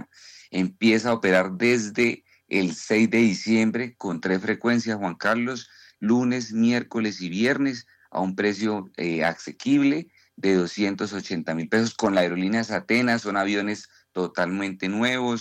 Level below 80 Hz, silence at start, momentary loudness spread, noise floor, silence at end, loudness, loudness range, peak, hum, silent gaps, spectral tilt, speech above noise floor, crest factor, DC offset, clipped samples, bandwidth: -70 dBFS; 0 s; 9 LU; -46 dBFS; 0 s; -24 LUFS; 3 LU; -10 dBFS; none; none; -5 dB/octave; 22 dB; 14 dB; under 0.1%; under 0.1%; 10.5 kHz